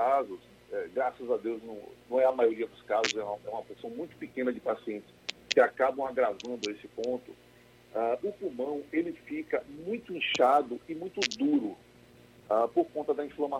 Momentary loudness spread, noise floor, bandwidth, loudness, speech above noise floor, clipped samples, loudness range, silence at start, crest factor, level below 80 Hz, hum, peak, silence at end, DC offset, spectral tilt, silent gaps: 14 LU; -58 dBFS; 13.5 kHz; -31 LUFS; 27 dB; under 0.1%; 5 LU; 0 s; 26 dB; -70 dBFS; 60 Hz at -65 dBFS; -6 dBFS; 0 s; under 0.1%; -3.5 dB/octave; none